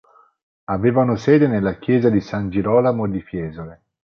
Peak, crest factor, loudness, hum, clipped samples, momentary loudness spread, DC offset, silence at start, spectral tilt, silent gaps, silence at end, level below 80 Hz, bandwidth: -2 dBFS; 16 dB; -19 LUFS; none; under 0.1%; 15 LU; under 0.1%; 0.7 s; -9 dB/octave; none; 0.45 s; -46 dBFS; 7 kHz